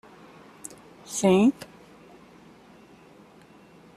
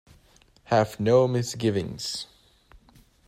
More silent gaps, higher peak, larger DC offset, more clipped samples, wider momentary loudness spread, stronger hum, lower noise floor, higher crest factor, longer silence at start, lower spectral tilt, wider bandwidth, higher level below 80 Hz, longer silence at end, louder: neither; about the same, -8 dBFS vs -8 dBFS; neither; neither; first, 25 LU vs 11 LU; neither; second, -53 dBFS vs -58 dBFS; about the same, 20 dB vs 20 dB; first, 1.1 s vs 0.7 s; about the same, -5.5 dB/octave vs -5.5 dB/octave; second, 14.5 kHz vs 16 kHz; second, -66 dBFS vs -58 dBFS; first, 2.45 s vs 1.05 s; first, -22 LUFS vs -25 LUFS